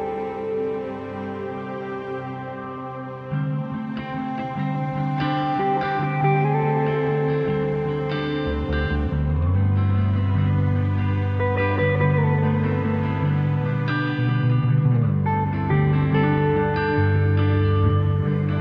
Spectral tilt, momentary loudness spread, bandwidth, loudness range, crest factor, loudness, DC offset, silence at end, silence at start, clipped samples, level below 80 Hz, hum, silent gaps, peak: -10 dB/octave; 11 LU; 5.2 kHz; 9 LU; 14 dB; -22 LUFS; under 0.1%; 0 s; 0 s; under 0.1%; -38 dBFS; none; none; -8 dBFS